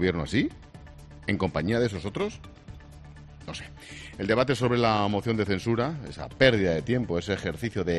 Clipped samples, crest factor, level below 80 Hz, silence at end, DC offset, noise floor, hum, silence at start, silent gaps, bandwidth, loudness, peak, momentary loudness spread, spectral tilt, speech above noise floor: under 0.1%; 22 dB; -48 dBFS; 0 s; under 0.1%; -46 dBFS; none; 0 s; none; 12 kHz; -27 LUFS; -6 dBFS; 24 LU; -6 dB/octave; 20 dB